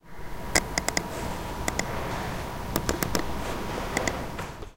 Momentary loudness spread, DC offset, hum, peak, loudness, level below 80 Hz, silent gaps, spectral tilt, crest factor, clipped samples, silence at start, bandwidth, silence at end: 8 LU; under 0.1%; none; -2 dBFS; -30 LUFS; -40 dBFS; none; -3.5 dB/octave; 28 dB; under 0.1%; 0 s; 17 kHz; 0 s